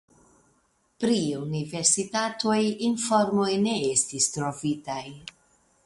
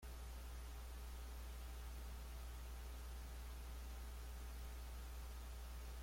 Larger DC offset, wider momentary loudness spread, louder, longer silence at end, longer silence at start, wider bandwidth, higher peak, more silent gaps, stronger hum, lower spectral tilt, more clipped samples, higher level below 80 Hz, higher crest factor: neither; first, 11 LU vs 1 LU; first, -25 LUFS vs -54 LUFS; first, 0.55 s vs 0 s; first, 1 s vs 0 s; second, 11.5 kHz vs 16.5 kHz; first, -6 dBFS vs -42 dBFS; neither; neither; about the same, -3.5 dB/octave vs -4.5 dB/octave; neither; second, -66 dBFS vs -52 dBFS; first, 20 dB vs 8 dB